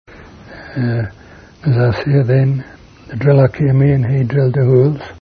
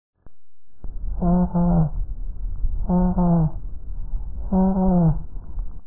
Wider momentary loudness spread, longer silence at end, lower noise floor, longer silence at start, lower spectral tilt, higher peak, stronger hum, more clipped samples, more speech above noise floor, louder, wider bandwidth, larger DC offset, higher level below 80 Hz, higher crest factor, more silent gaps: second, 11 LU vs 18 LU; about the same, 0.05 s vs 0.05 s; second, -37 dBFS vs -64 dBFS; about the same, 0.2 s vs 0.1 s; second, -10 dB/octave vs -16.5 dB/octave; first, 0 dBFS vs -8 dBFS; neither; neither; second, 24 dB vs 46 dB; first, -14 LUFS vs -21 LUFS; first, 5 kHz vs 1.6 kHz; second, under 0.1% vs 3%; second, -42 dBFS vs -28 dBFS; about the same, 14 dB vs 14 dB; neither